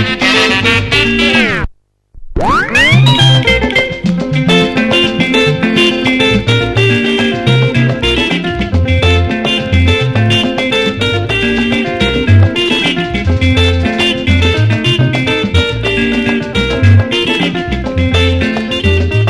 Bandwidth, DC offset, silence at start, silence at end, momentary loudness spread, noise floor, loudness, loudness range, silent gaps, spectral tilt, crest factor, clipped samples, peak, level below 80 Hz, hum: 12 kHz; under 0.1%; 0 s; 0 s; 6 LU; -40 dBFS; -10 LUFS; 2 LU; none; -5.5 dB/octave; 10 dB; 0.1%; 0 dBFS; -22 dBFS; none